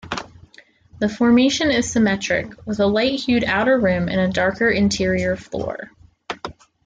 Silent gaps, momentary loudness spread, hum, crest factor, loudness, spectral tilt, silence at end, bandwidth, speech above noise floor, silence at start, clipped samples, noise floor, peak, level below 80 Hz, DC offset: none; 14 LU; none; 14 dB; -19 LUFS; -5 dB/octave; 0.35 s; 9.4 kHz; 32 dB; 0.05 s; under 0.1%; -50 dBFS; -6 dBFS; -48 dBFS; under 0.1%